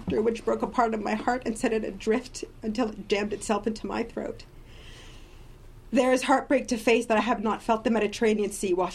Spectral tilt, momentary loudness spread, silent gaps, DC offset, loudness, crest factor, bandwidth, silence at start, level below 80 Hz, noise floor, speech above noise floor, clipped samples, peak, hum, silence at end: -4.5 dB/octave; 11 LU; none; under 0.1%; -27 LUFS; 18 dB; 14 kHz; 0 s; -48 dBFS; -47 dBFS; 20 dB; under 0.1%; -8 dBFS; none; 0 s